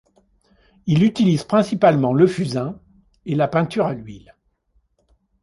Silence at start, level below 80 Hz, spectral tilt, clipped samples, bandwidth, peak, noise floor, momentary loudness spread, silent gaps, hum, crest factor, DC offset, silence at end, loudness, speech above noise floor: 0.85 s; -54 dBFS; -7.5 dB/octave; under 0.1%; 11.5 kHz; -2 dBFS; -64 dBFS; 16 LU; none; none; 18 dB; under 0.1%; 1.25 s; -19 LUFS; 46 dB